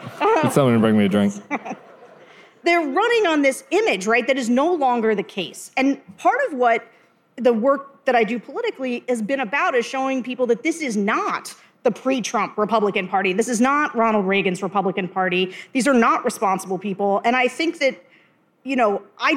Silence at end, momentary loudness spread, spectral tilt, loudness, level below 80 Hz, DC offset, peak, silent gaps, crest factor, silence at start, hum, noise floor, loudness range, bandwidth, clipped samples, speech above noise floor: 0 s; 8 LU; -5 dB/octave; -20 LUFS; -68 dBFS; under 0.1%; -2 dBFS; none; 18 dB; 0 s; none; -58 dBFS; 3 LU; 15.5 kHz; under 0.1%; 38 dB